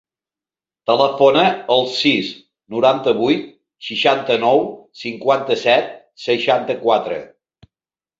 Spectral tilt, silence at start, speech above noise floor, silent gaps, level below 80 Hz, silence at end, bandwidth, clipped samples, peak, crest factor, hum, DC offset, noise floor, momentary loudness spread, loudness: -5 dB/octave; 0.9 s; over 74 dB; none; -64 dBFS; 0.95 s; 7.8 kHz; under 0.1%; -2 dBFS; 16 dB; none; under 0.1%; under -90 dBFS; 15 LU; -17 LUFS